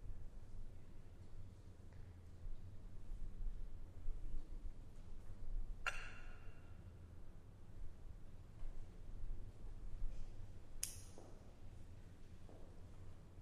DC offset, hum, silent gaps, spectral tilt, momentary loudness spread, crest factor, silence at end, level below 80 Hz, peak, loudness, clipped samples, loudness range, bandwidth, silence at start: under 0.1%; none; none; -3.5 dB/octave; 13 LU; 24 dB; 0 s; -50 dBFS; -24 dBFS; -56 LUFS; under 0.1%; 6 LU; 14 kHz; 0 s